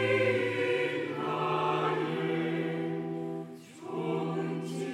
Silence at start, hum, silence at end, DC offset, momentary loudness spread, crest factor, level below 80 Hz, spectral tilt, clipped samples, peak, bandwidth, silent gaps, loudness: 0 s; none; 0 s; under 0.1%; 10 LU; 16 dB; -80 dBFS; -6.5 dB/octave; under 0.1%; -16 dBFS; 13 kHz; none; -31 LUFS